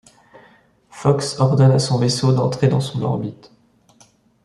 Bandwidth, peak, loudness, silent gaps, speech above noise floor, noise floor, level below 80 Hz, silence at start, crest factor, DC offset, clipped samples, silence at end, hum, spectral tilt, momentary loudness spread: 11.5 kHz; -2 dBFS; -18 LUFS; none; 37 dB; -54 dBFS; -56 dBFS; 0.95 s; 18 dB; under 0.1%; under 0.1%; 1.1 s; none; -6.5 dB/octave; 8 LU